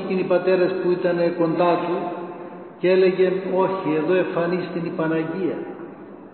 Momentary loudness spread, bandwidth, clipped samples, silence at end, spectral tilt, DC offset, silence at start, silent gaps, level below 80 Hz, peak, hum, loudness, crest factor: 16 LU; 4.4 kHz; under 0.1%; 0 s; -11.5 dB/octave; under 0.1%; 0 s; none; -70 dBFS; -8 dBFS; none; -21 LUFS; 14 dB